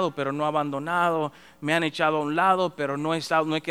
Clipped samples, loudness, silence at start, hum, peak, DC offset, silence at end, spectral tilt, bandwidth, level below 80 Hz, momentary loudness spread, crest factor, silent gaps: under 0.1%; -25 LUFS; 0 s; none; -6 dBFS; 0.1%; 0 s; -5.5 dB/octave; 15.5 kHz; -68 dBFS; 6 LU; 18 dB; none